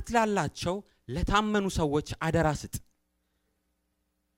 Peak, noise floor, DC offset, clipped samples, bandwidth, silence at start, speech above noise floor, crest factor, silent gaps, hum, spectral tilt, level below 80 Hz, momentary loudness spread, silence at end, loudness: -12 dBFS; -77 dBFS; under 0.1%; under 0.1%; 16 kHz; 0 s; 49 dB; 20 dB; none; none; -5.5 dB/octave; -44 dBFS; 12 LU; 1.6 s; -29 LUFS